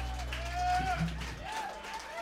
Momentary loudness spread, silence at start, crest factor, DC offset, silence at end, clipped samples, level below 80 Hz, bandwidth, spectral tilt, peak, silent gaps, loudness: 9 LU; 0 s; 14 dB; under 0.1%; 0 s; under 0.1%; -42 dBFS; 16 kHz; -4.5 dB/octave; -20 dBFS; none; -35 LUFS